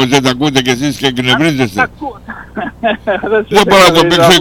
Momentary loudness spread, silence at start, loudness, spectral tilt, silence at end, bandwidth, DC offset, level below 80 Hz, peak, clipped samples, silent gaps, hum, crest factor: 17 LU; 0 s; -10 LUFS; -4 dB/octave; 0 s; 19.5 kHz; under 0.1%; -38 dBFS; 0 dBFS; 0.8%; none; none; 10 dB